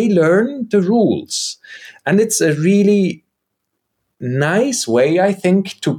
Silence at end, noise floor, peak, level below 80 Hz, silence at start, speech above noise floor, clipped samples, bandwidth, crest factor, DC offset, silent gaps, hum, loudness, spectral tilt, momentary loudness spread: 0 s; -74 dBFS; -4 dBFS; -64 dBFS; 0 s; 60 dB; under 0.1%; 18.5 kHz; 12 dB; under 0.1%; none; none; -15 LUFS; -5 dB/octave; 12 LU